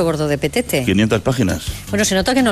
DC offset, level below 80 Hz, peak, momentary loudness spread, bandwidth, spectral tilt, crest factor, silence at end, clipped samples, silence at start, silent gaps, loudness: under 0.1%; -36 dBFS; -4 dBFS; 5 LU; 15.5 kHz; -4.5 dB/octave; 12 dB; 0 s; under 0.1%; 0 s; none; -17 LUFS